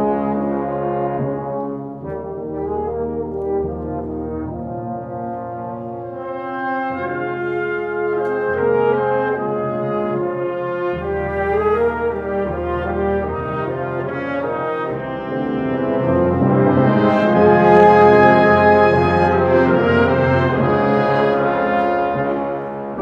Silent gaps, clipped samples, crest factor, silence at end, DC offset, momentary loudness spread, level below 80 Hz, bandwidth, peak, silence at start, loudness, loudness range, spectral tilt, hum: none; under 0.1%; 18 dB; 0 s; under 0.1%; 15 LU; -42 dBFS; 6.6 kHz; 0 dBFS; 0 s; -18 LUFS; 12 LU; -9 dB/octave; none